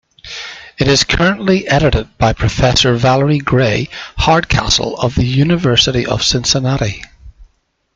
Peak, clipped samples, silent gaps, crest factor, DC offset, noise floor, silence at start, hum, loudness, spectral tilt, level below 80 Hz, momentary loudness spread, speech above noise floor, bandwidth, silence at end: 0 dBFS; under 0.1%; none; 14 dB; under 0.1%; -56 dBFS; 0.25 s; none; -13 LUFS; -4.5 dB/octave; -30 dBFS; 10 LU; 43 dB; 9.2 kHz; 0.5 s